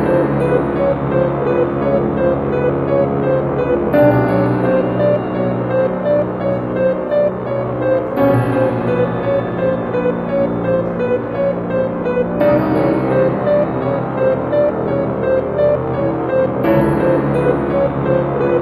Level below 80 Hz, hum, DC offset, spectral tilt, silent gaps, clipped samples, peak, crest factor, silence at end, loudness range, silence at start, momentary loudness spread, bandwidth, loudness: -40 dBFS; none; under 0.1%; -10 dB/octave; none; under 0.1%; 0 dBFS; 14 dB; 0 s; 2 LU; 0 s; 4 LU; 12.5 kHz; -16 LUFS